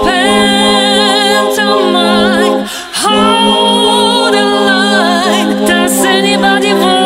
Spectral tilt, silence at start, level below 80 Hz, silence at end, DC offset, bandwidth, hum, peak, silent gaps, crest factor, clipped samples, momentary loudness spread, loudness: -3 dB/octave; 0 s; -40 dBFS; 0 s; 0.1%; 16.5 kHz; none; 0 dBFS; none; 10 dB; under 0.1%; 3 LU; -9 LUFS